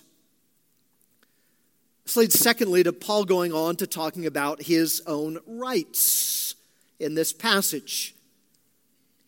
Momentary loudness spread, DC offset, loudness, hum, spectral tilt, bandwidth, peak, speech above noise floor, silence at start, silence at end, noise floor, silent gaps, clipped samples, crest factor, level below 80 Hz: 12 LU; under 0.1%; -23 LUFS; none; -2.5 dB/octave; 17 kHz; -4 dBFS; 45 dB; 2.05 s; 1.15 s; -69 dBFS; none; under 0.1%; 22 dB; -78 dBFS